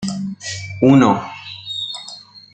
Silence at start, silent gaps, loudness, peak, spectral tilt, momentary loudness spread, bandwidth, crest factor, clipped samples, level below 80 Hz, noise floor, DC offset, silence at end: 0 s; none; -17 LUFS; -2 dBFS; -5.5 dB/octave; 19 LU; 9 kHz; 16 dB; under 0.1%; -54 dBFS; -39 dBFS; under 0.1%; 0.15 s